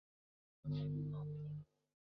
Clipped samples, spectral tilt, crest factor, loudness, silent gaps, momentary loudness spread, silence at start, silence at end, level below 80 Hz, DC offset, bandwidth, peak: under 0.1%; -10 dB/octave; 12 dB; -45 LUFS; none; 11 LU; 0.65 s; 0.55 s; -70 dBFS; under 0.1%; 5.2 kHz; -34 dBFS